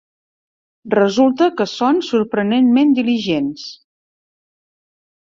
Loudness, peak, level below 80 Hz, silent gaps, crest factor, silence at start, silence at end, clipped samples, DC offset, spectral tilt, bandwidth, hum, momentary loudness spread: -16 LUFS; -2 dBFS; -60 dBFS; none; 16 dB; 0.85 s; 1.5 s; under 0.1%; under 0.1%; -6 dB/octave; 7.4 kHz; none; 7 LU